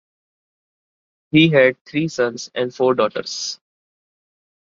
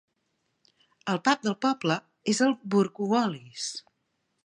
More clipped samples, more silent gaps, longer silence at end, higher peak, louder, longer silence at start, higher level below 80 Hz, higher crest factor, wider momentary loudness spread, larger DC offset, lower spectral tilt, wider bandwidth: neither; first, 1.81-1.85 s vs none; first, 1.15 s vs 0.65 s; first, -2 dBFS vs -8 dBFS; first, -18 LUFS vs -27 LUFS; first, 1.35 s vs 1.05 s; first, -64 dBFS vs -78 dBFS; about the same, 20 dB vs 20 dB; about the same, 12 LU vs 10 LU; neither; about the same, -5 dB/octave vs -4.5 dB/octave; second, 7.6 kHz vs 11 kHz